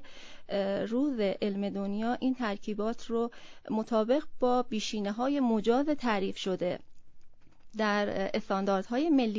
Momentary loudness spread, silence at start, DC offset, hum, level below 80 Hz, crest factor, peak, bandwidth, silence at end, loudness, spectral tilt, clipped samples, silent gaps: 7 LU; 0 s; under 0.1%; none; -60 dBFS; 16 dB; -14 dBFS; 7.6 kHz; 0 s; -31 LUFS; -6 dB/octave; under 0.1%; none